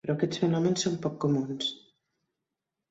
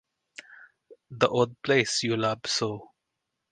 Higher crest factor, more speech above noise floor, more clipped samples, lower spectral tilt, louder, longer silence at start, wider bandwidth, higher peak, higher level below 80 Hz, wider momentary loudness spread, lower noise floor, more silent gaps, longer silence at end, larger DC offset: second, 18 dB vs 26 dB; about the same, 58 dB vs 57 dB; neither; first, -5.5 dB/octave vs -4 dB/octave; second, -29 LUFS vs -26 LUFS; second, 0.05 s vs 0.5 s; second, 8 kHz vs 10 kHz; second, -12 dBFS vs -4 dBFS; about the same, -68 dBFS vs -66 dBFS; second, 7 LU vs 23 LU; first, -87 dBFS vs -83 dBFS; neither; first, 1.15 s vs 0.65 s; neither